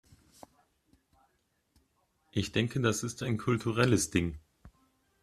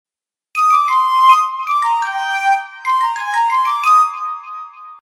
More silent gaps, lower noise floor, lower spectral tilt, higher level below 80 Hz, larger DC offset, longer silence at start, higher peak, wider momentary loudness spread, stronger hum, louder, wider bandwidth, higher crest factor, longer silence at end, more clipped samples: neither; first, -75 dBFS vs -70 dBFS; first, -5 dB/octave vs 3.5 dB/octave; first, -58 dBFS vs -72 dBFS; neither; first, 2.35 s vs 0.55 s; second, -12 dBFS vs 0 dBFS; second, 10 LU vs 14 LU; neither; second, -31 LUFS vs -14 LUFS; second, 14.5 kHz vs 18 kHz; first, 22 dB vs 16 dB; first, 0.55 s vs 0.05 s; neither